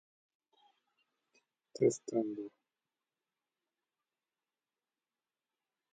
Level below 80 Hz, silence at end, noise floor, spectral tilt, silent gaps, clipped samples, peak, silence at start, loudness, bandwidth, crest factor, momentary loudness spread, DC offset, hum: -88 dBFS; 3.45 s; under -90 dBFS; -6 dB/octave; none; under 0.1%; -18 dBFS; 1.75 s; -35 LUFS; 8.4 kHz; 26 dB; 18 LU; under 0.1%; none